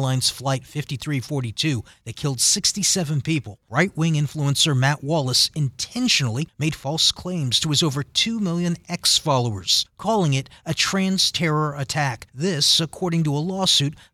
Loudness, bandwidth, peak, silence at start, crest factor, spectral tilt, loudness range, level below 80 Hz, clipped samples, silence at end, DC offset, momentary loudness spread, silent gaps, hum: -21 LUFS; 16 kHz; -4 dBFS; 0 s; 18 dB; -3.5 dB/octave; 1 LU; -54 dBFS; under 0.1%; 0.2 s; under 0.1%; 9 LU; none; none